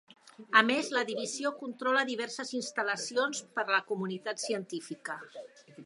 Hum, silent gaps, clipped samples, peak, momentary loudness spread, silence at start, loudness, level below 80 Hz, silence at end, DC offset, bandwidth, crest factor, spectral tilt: none; none; under 0.1%; -8 dBFS; 15 LU; 0.4 s; -31 LUFS; -88 dBFS; 0 s; under 0.1%; 11.5 kHz; 26 dB; -2.5 dB/octave